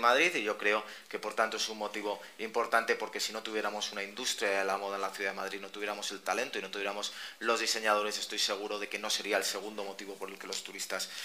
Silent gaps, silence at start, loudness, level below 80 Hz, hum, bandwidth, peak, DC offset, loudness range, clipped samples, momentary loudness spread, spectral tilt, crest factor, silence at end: none; 0 s; -33 LUFS; -86 dBFS; none; 15.5 kHz; -12 dBFS; under 0.1%; 2 LU; under 0.1%; 10 LU; -1 dB/octave; 22 dB; 0 s